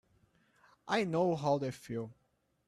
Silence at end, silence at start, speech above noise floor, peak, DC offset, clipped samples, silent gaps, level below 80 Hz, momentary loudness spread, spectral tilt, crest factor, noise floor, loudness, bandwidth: 0.55 s; 0.85 s; 37 dB; -18 dBFS; under 0.1%; under 0.1%; none; -72 dBFS; 14 LU; -6.5 dB/octave; 18 dB; -71 dBFS; -34 LUFS; 13.5 kHz